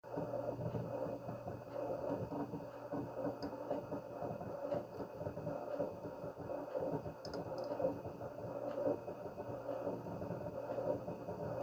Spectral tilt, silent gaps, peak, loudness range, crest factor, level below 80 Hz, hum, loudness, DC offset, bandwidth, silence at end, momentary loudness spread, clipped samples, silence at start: -8 dB/octave; none; -24 dBFS; 1 LU; 18 dB; -68 dBFS; none; -43 LUFS; under 0.1%; over 20 kHz; 0 s; 6 LU; under 0.1%; 0.05 s